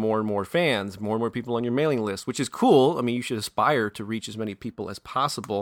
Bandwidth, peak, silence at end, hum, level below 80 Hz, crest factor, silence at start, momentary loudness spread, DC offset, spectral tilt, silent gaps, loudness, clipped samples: 18 kHz; -6 dBFS; 0 s; none; -62 dBFS; 18 dB; 0 s; 13 LU; under 0.1%; -5.5 dB/octave; none; -25 LUFS; under 0.1%